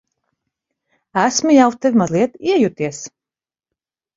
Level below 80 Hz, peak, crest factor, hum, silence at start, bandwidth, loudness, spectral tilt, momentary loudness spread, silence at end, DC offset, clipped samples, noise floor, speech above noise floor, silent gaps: -60 dBFS; 0 dBFS; 18 dB; none; 1.15 s; 7.8 kHz; -16 LUFS; -4.5 dB/octave; 12 LU; 1.1 s; under 0.1%; under 0.1%; under -90 dBFS; over 75 dB; none